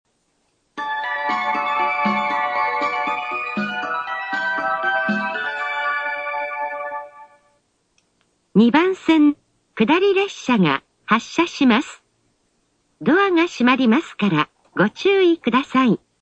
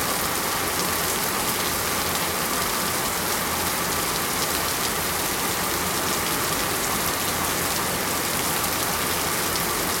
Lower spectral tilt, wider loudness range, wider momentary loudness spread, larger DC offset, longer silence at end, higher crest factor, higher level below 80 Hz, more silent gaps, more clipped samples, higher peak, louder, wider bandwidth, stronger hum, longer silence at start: first, -5.5 dB/octave vs -2 dB/octave; first, 5 LU vs 0 LU; first, 10 LU vs 1 LU; neither; first, 0.25 s vs 0 s; about the same, 20 dB vs 18 dB; second, -62 dBFS vs -46 dBFS; neither; neither; first, 0 dBFS vs -6 dBFS; first, -19 LUFS vs -23 LUFS; second, 8.4 kHz vs 17 kHz; neither; first, 0.75 s vs 0 s